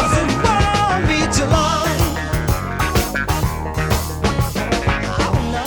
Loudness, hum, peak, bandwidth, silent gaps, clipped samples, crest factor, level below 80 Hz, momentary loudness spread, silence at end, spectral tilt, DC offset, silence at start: -18 LUFS; none; 0 dBFS; 19.5 kHz; none; under 0.1%; 16 dB; -26 dBFS; 5 LU; 0 s; -5 dB/octave; under 0.1%; 0 s